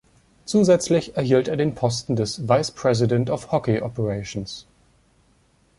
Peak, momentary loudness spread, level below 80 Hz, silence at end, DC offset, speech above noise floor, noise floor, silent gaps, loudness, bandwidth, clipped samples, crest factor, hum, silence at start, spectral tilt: -4 dBFS; 12 LU; -52 dBFS; 1.15 s; under 0.1%; 39 dB; -60 dBFS; none; -22 LUFS; 11.5 kHz; under 0.1%; 18 dB; none; 0.45 s; -6 dB/octave